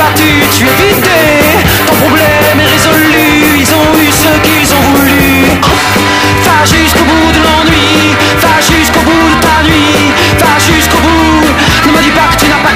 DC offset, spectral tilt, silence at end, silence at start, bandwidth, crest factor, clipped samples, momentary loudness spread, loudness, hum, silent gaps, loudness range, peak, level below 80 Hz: under 0.1%; -4 dB/octave; 0 s; 0 s; 16.5 kHz; 6 dB; 0.4%; 1 LU; -5 LUFS; none; none; 0 LU; 0 dBFS; -24 dBFS